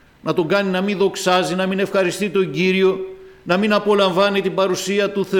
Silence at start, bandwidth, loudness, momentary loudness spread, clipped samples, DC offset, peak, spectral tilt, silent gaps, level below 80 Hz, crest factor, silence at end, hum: 0.25 s; 17 kHz; -18 LUFS; 6 LU; under 0.1%; under 0.1%; -6 dBFS; -5 dB/octave; none; -58 dBFS; 12 dB; 0 s; none